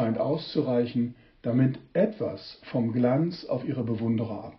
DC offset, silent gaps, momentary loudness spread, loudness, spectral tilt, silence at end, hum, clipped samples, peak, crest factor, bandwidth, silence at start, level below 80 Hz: under 0.1%; none; 9 LU; -28 LUFS; -7.5 dB/octave; 0.05 s; none; under 0.1%; -10 dBFS; 16 dB; 6 kHz; 0 s; -64 dBFS